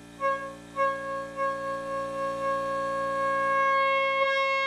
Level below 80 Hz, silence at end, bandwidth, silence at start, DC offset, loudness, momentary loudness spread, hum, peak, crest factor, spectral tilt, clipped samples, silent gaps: -62 dBFS; 0 s; 12.5 kHz; 0 s; under 0.1%; -27 LUFS; 9 LU; none; -14 dBFS; 14 dB; -3.5 dB/octave; under 0.1%; none